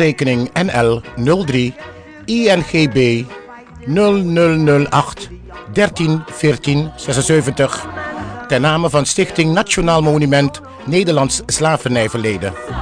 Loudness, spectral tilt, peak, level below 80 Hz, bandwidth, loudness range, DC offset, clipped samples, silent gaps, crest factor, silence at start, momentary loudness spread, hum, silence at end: -15 LUFS; -5 dB/octave; -2 dBFS; -38 dBFS; 10 kHz; 2 LU; under 0.1%; under 0.1%; none; 14 dB; 0 s; 12 LU; none; 0 s